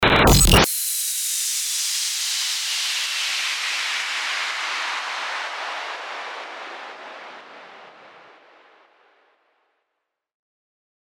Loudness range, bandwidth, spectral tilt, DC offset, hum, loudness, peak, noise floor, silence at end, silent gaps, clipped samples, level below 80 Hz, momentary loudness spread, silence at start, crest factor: 20 LU; over 20 kHz; -2.5 dB/octave; under 0.1%; none; -21 LUFS; -2 dBFS; -80 dBFS; 2.85 s; none; under 0.1%; -34 dBFS; 22 LU; 0 s; 22 dB